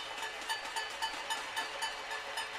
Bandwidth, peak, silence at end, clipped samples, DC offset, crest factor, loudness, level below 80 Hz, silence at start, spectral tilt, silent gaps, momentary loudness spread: 16 kHz; -22 dBFS; 0 s; under 0.1%; under 0.1%; 18 dB; -37 LUFS; -70 dBFS; 0 s; 0.5 dB/octave; none; 3 LU